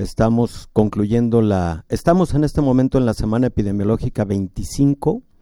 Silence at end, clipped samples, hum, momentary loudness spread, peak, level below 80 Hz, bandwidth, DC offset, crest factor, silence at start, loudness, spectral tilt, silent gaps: 0.2 s; under 0.1%; none; 5 LU; -2 dBFS; -32 dBFS; 16.5 kHz; under 0.1%; 16 dB; 0 s; -18 LUFS; -8 dB/octave; none